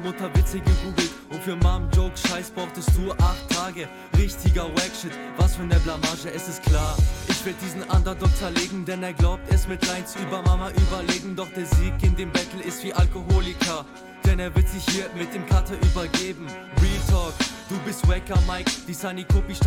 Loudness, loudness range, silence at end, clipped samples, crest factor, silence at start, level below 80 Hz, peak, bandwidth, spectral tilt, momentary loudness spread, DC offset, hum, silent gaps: -24 LUFS; 1 LU; 0 s; under 0.1%; 16 dB; 0 s; -24 dBFS; -6 dBFS; 16.5 kHz; -5 dB/octave; 9 LU; under 0.1%; none; none